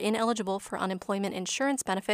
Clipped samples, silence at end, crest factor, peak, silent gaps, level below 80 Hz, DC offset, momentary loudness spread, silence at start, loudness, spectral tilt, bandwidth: under 0.1%; 0 s; 16 dB; -14 dBFS; none; -68 dBFS; under 0.1%; 4 LU; 0 s; -30 LUFS; -3.5 dB/octave; 15.5 kHz